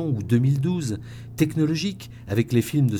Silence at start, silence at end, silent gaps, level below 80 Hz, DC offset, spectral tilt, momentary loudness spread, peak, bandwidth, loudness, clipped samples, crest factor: 0 s; 0 s; none; -52 dBFS; under 0.1%; -7 dB/octave; 11 LU; -8 dBFS; 18 kHz; -24 LUFS; under 0.1%; 16 dB